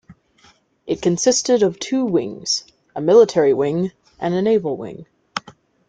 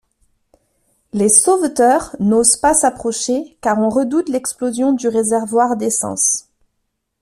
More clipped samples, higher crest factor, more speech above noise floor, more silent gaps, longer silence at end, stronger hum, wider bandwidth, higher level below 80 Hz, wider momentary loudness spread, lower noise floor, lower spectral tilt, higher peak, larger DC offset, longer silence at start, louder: neither; about the same, 18 dB vs 16 dB; second, 37 dB vs 56 dB; neither; second, 0.4 s vs 0.8 s; neither; second, 9.4 kHz vs 15 kHz; second, -60 dBFS vs -50 dBFS; first, 17 LU vs 9 LU; second, -55 dBFS vs -72 dBFS; about the same, -4.5 dB/octave vs -3.5 dB/octave; about the same, -2 dBFS vs 0 dBFS; neither; second, 0.1 s vs 1.15 s; second, -18 LUFS vs -15 LUFS